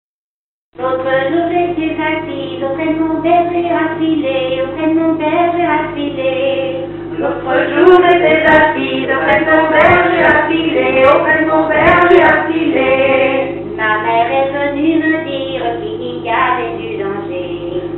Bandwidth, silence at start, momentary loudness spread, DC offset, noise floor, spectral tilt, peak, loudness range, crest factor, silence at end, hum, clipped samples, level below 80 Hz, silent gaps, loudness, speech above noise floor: 4.2 kHz; 0.8 s; 12 LU; under 0.1%; under -90 dBFS; -7.5 dB/octave; 0 dBFS; 6 LU; 12 dB; 0 s; none; under 0.1%; -42 dBFS; none; -13 LUFS; over 78 dB